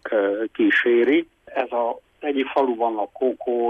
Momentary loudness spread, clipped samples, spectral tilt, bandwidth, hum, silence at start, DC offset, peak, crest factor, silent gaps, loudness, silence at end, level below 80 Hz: 10 LU; under 0.1%; -6 dB/octave; 4.4 kHz; none; 0.05 s; under 0.1%; -8 dBFS; 14 dB; none; -22 LUFS; 0 s; -66 dBFS